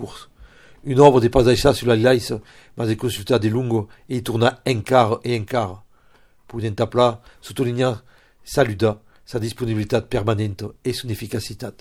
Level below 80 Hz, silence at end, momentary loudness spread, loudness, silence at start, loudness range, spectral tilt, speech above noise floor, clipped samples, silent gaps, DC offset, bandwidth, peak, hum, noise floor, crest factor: -42 dBFS; 0.1 s; 14 LU; -20 LUFS; 0 s; 6 LU; -6 dB/octave; 34 dB; under 0.1%; none; under 0.1%; 16 kHz; 0 dBFS; none; -53 dBFS; 20 dB